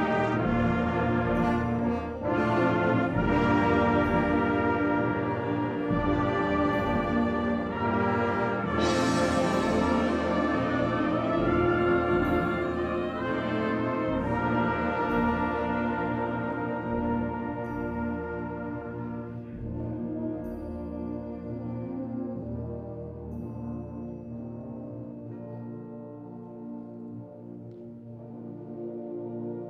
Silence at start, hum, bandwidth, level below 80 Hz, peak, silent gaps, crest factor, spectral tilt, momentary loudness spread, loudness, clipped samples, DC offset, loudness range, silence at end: 0 s; none; 10.5 kHz; -46 dBFS; -12 dBFS; none; 16 dB; -7 dB/octave; 16 LU; -28 LUFS; under 0.1%; under 0.1%; 14 LU; 0 s